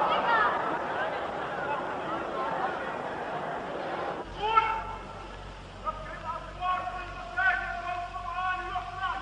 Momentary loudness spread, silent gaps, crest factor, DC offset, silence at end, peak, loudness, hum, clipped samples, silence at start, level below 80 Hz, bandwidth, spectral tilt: 12 LU; none; 22 dB; under 0.1%; 0 s; -10 dBFS; -31 LUFS; none; under 0.1%; 0 s; -50 dBFS; 10 kHz; -5 dB/octave